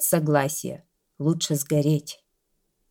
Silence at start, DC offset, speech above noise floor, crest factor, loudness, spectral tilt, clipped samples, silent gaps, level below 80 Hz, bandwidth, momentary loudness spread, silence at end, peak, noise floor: 0 s; under 0.1%; 50 dB; 20 dB; -24 LUFS; -5 dB/octave; under 0.1%; none; -66 dBFS; 17.5 kHz; 19 LU; 0.75 s; -6 dBFS; -73 dBFS